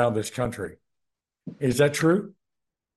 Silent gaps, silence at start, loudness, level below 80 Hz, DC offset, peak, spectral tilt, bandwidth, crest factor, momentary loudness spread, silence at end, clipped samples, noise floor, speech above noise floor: none; 0 s; -24 LUFS; -58 dBFS; under 0.1%; -8 dBFS; -5.5 dB/octave; 12.5 kHz; 18 dB; 22 LU; 0.65 s; under 0.1%; -85 dBFS; 61 dB